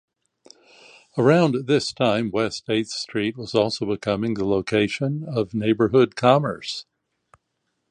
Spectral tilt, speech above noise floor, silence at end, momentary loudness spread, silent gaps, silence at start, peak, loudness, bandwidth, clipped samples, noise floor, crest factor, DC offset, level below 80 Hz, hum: -6 dB/octave; 54 dB; 1.1 s; 9 LU; none; 1.15 s; -2 dBFS; -22 LUFS; 10.5 kHz; under 0.1%; -75 dBFS; 20 dB; under 0.1%; -56 dBFS; none